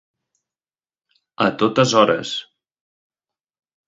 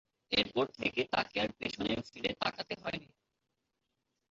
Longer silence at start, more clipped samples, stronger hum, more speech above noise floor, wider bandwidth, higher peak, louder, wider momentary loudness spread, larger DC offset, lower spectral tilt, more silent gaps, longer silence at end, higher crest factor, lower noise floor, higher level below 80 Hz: first, 1.4 s vs 0.3 s; neither; neither; first, over 73 dB vs 50 dB; about the same, 8 kHz vs 7.6 kHz; first, 0 dBFS vs -14 dBFS; first, -18 LUFS vs -35 LUFS; first, 12 LU vs 8 LU; neither; first, -4.5 dB/octave vs -1.5 dB/octave; neither; first, 1.45 s vs 1.3 s; about the same, 22 dB vs 24 dB; first, under -90 dBFS vs -85 dBFS; about the same, -62 dBFS vs -64 dBFS